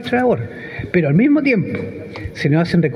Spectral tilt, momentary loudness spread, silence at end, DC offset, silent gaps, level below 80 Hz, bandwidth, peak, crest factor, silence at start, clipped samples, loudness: -8.5 dB/octave; 15 LU; 0 s; under 0.1%; none; -46 dBFS; 10.5 kHz; -2 dBFS; 14 dB; 0 s; under 0.1%; -17 LUFS